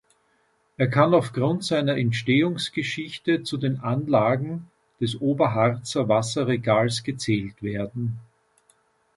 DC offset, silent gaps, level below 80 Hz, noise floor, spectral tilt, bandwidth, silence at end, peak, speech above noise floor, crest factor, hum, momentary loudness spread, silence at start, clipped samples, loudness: under 0.1%; none; -60 dBFS; -67 dBFS; -6 dB/octave; 11.5 kHz; 0.95 s; -4 dBFS; 43 dB; 20 dB; none; 9 LU; 0.8 s; under 0.1%; -24 LUFS